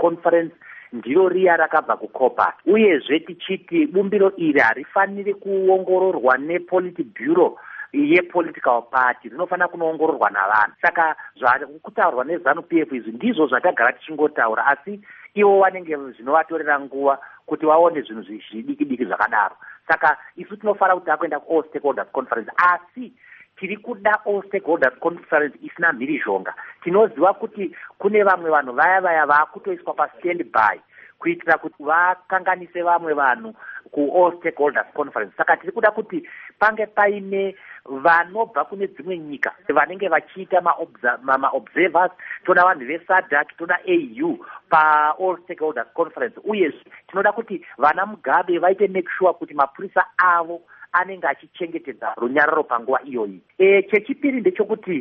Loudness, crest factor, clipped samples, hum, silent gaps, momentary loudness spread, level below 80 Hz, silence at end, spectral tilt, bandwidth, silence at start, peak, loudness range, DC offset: -20 LUFS; 18 dB; under 0.1%; none; none; 12 LU; -68 dBFS; 0 s; -3 dB/octave; 5.6 kHz; 0 s; -2 dBFS; 3 LU; under 0.1%